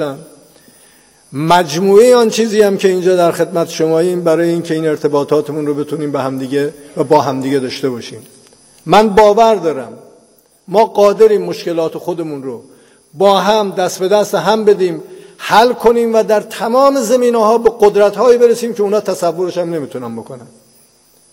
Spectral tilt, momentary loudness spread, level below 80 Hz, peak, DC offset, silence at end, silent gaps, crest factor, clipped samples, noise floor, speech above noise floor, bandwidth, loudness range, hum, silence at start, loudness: -5 dB/octave; 14 LU; -50 dBFS; 0 dBFS; under 0.1%; 0.85 s; none; 12 dB; 0.1%; -50 dBFS; 37 dB; 16.5 kHz; 4 LU; none; 0 s; -12 LUFS